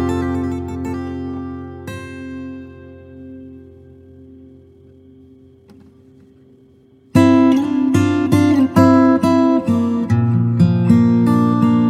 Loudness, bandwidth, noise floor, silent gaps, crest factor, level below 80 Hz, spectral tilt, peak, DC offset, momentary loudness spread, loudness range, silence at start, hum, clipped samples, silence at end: -15 LUFS; 13.5 kHz; -49 dBFS; none; 16 dB; -46 dBFS; -8 dB/octave; 0 dBFS; under 0.1%; 19 LU; 20 LU; 0 s; none; under 0.1%; 0 s